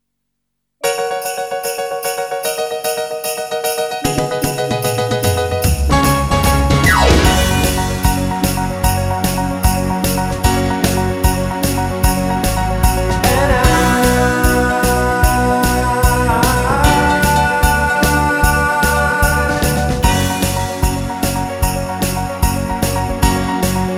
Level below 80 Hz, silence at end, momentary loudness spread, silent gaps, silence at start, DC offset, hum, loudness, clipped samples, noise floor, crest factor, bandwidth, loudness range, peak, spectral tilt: -22 dBFS; 0 s; 7 LU; none; 0.85 s; under 0.1%; none; -15 LUFS; under 0.1%; -74 dBFS; 14 dB; 16.5 kHz; 5 LU; 0 dBFS; -4.5 dB/octave